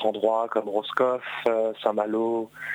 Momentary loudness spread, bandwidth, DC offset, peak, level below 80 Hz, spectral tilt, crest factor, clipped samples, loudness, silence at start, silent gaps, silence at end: 4 LU; 16 kHz; under 0.1%; -8 dBFS; -76 dBFS; -5.5 dB/octave; 16 dB; under 0.1%; -26 LUFS; 0 s; none; 0 s